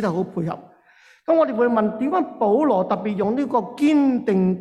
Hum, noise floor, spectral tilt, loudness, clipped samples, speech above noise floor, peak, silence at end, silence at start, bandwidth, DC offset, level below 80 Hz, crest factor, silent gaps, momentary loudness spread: none; -54 dBFS; -8.5 dB/octave; -20 LUFS; under 0.1%; 34 dB; -8 dBFS; 0 s; 0 s; 10.5 kHz; under 0.1%; -62 dBFS; 14 dB; none; 9 LU